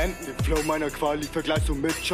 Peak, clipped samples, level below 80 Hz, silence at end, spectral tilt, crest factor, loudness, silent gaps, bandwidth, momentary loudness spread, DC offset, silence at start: -12 dBFS; under 0.1%; -34 dBFS; 0 s; -4.5 dB/octave; 14 dB; -26 LUFS; none; 15.5 kHz; 4 LU; under 0.1%; 0 s